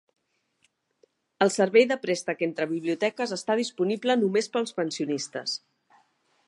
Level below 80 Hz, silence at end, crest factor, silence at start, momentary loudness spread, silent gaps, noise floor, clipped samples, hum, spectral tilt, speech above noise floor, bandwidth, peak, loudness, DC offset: -82 dBFS; 0.9 s; 20 dB; 1.4 s; 10 LU; none; -71 dBFS; under 0.1%; none; -4 dB/octave; 45 dB; 11.5 kHz; -6 dBFS; -26 LUFS; under 0.1%